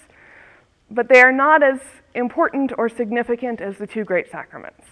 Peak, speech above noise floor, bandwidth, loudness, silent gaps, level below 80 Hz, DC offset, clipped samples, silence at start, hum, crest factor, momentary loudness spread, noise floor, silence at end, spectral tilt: 0 dBFS; 33 dB; 11 kHz; -17 LUFS; none; -62 dBFS; under 0.1%; under 0.1%; 0.9 s; none; 20 dB; 20 LU; -51 dBFS; 0.25 s; -5 dB/octave